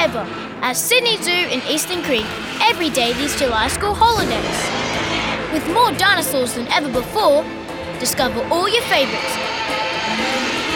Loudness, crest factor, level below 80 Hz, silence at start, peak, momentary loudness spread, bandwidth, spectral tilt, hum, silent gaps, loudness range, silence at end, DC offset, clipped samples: -18 LUFS; 16 dB; -42 dBFS; 0 s; -2 dBFS; 6 LU; over 20 kHz; -2.5 dB/octave; none; none; 1 LU; 0 s; under 0.1%; under 0.1%